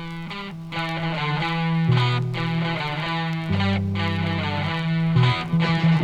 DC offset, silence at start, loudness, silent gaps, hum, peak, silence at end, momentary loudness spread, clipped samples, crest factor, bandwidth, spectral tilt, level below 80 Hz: under 0.1%; 0 s; -23 LUFS; none; none; -8 dBFS; 0 s; 8 LU; under 0.1%; 16 dB; 8.2 kHz; -7 dB/octave; -50 dBFS